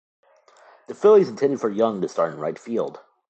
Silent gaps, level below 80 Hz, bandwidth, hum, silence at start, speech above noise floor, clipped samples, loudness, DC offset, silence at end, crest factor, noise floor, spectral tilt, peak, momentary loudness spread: none; -74 dBFS; 8.2 kHz; none; 0.9 s; 33 dB; under 0.1%; -21 LUFS; under 0.1%; 0.3 s; 16 dB; -53 dBFS; -7 dB/octave; -6 dBFS; 14 LU